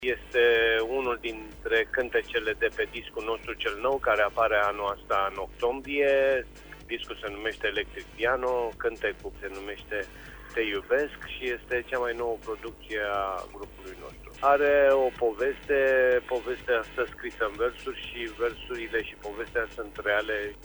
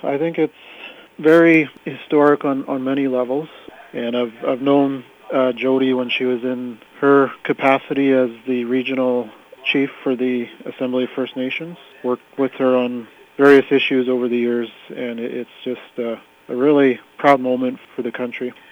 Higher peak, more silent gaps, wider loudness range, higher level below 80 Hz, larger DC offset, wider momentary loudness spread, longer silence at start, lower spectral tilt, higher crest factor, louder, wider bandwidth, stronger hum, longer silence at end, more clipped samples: second, -10 dBFS vs -2 dBFS; neither; about the same, 6 LU vs 4 LU; first, -50 dBFS vs -70 dBFS; neither; about the same, 14 LU vs 14 LU; about the same, 0 s vs 0.05 s; second, -4.5 dB/octave vs -7 dB/octave; about the same, 18 dB vs 18 dB; second, -28 LUFS vs -18 LUFS; about the same, over 20 kHz vs over 20 kHz; first, 50 Hz at -50 dBFS vs none; second, 0 s vs 0.2 s; neither